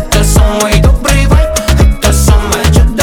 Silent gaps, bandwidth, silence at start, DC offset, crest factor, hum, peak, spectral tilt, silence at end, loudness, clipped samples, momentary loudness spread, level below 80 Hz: none; 18.5 kHz; 0 s; under 0.1%; 8 dB; none; 0 dBFS; -5 dB/octave; 0 s; -9 LUFS; 0.2%; 1 LU; -10 dBFS